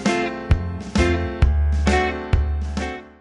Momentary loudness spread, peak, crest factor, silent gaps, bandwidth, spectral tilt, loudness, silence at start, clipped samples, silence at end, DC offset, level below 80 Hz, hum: 7 LU; -2 dBFS; 18 dB; none; 10.5 kHz; -6 dB/octave; -22 LUFS; 0 s; under 0.1%; 0.1 s; under 0.1%; -24 dBFS; none